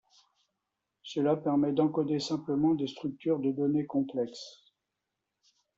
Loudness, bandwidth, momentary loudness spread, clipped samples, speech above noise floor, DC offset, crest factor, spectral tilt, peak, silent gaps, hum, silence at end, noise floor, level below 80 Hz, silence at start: -30 LUFS; 7.8 kHz; 10 LU; under 0.1%; 56 dB; under 0.1%; 18 dB; -7 dB/octave; -14 dBFS; none; none; 1.25 s; -86 dBFS; -72 dBFS; 1.05 s